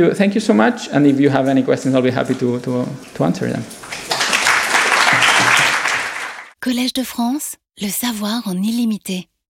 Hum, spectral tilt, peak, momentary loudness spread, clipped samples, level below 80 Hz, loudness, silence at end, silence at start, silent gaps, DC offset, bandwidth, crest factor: none; -4 dB/octave; 0 dBFS; 14 LU; under 0.1%; -58 dBFS; -16 LUFS; 0.25 s; 0 s; none; under 0.1%; 17 kHz; 16 dB